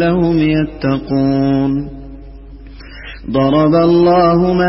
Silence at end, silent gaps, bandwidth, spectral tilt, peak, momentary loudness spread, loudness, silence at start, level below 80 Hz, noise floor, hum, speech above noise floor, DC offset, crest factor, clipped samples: 0 s; none; 5.8 kHz; -12 dB/octave; -2 dBFS; 19 LU; -13 LUFS; 0 s; -34 dBFS; -33 dBFS; none; 21 dB; under 0.1%; 12 dB; under 0.1%